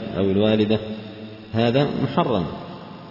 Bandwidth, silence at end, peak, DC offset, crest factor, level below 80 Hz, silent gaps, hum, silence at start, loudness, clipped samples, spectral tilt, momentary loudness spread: 5.8 kHz; 0 s; -6 dBFS; under 0.1%; 16 dB; -52 dBFS; none; none; 0 s; -21 LUFS; under 0.1%; -8.5 dB/octave; 18 LU